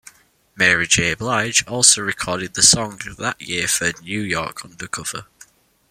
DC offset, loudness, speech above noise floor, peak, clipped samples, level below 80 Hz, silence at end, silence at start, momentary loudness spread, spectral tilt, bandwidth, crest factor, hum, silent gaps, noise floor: under 0.1%; -17 LUFS; 34 dB; 0 dBFS; under 0.1%; -50 dBFS; 0.65 s; 0.55 s; 16 LU; -1.5 dB/octave; 16.5 kHz; 20 dB; none; none; -53 dBFS